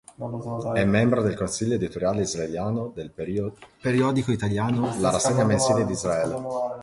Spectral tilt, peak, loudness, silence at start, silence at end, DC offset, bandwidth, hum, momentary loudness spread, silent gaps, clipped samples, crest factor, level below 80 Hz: -5.5 dB/octave; -6 dBFS; -25 LUFS; 0.2 s; 0 s; under 0.1%; 11.5 kHz; none; 10 LU; none; under 0.1%; 18 dB; -50 dBFS